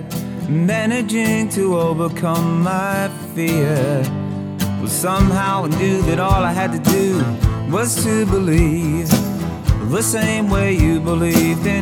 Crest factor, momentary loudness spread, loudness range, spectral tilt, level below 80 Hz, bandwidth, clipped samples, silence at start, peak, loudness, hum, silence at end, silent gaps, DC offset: 16 dB; 6 LU; 2 LU; -5.5 dB/octave; -28 dBFS; over 20 kHz; under 0.1%; 0 s; 0 dBFS; -17 LUFS; none; 0 s; none; under 0.1%